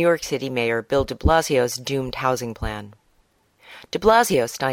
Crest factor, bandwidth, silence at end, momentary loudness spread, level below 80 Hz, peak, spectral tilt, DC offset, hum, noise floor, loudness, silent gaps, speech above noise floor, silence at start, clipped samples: 18 dB; 18 kHz; 0 s; 13 LU; -36 dBFS; -4 dBFS; -4.5 dB/octave; under 0.1%; none; -62 dBFS; -21 LUFS; none; 42 dB; 0 s; under 0.1%